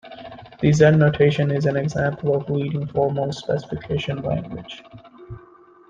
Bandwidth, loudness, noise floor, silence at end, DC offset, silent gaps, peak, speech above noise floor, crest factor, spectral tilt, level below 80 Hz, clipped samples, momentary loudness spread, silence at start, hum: 7.6 kHz; -21 LUFS; -49 dBFS; 0.5 s; under 0.1%; none; -2 dBFS; 29 dB; 20 dB; -7 dB/octave; -50 dBFS; under 0.1%; 24 LU; 0.05 s; none